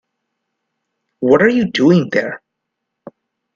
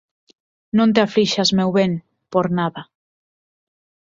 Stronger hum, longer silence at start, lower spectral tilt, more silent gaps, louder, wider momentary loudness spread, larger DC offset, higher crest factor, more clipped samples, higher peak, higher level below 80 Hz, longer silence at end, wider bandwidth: neither; first, 1.2 s vs 0.75 s; first, -7 dB/octave vs -5.5 dB/octave; neither; first, -14 LUFS vs -18 LUFS; first, 13 LU vs 9 LU; neither; about the same, 18 dB vs 18 dB; neither; about the same, 0 dBFS vs -2 dBFS; about the same, -56 dBFS vs -58 dBFS; about the same, 1.2 s vs 1.2 s; about the same, 7.2 kHz vs 7.6 kHz